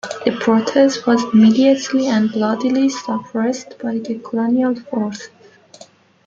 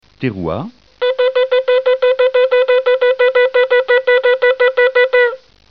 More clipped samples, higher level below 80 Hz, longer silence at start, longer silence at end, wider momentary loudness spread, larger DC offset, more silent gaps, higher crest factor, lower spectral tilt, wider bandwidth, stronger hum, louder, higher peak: neither; second, -62 dBFS vs -52 dBFS; second, 0.05 s vs 0.2 s; first, 1 s vs 0.35 s; about the same, 12 LU vs 10 LU; second, under 0.1% vs 0.3%; neither; first, 16 dB vs 10 dB; about the same, -5.5 dB/octave vs -6.5 dB/octave; first, 7.6 kHz vs 5.2 kHz; neither; second, -17 LUFS vs -13 LUFS; first, 0 dBFS vs -4 dBFS